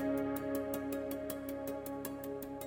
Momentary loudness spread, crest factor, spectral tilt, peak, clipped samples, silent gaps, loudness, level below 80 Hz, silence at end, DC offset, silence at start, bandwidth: 5 LU; 16 dB; -5.5 dB/octave; -22 dBFS; under 0.1%; none; -40 LUFS; -62 dBFS; 0 s; under 0.1%; 0 s; 17 kHz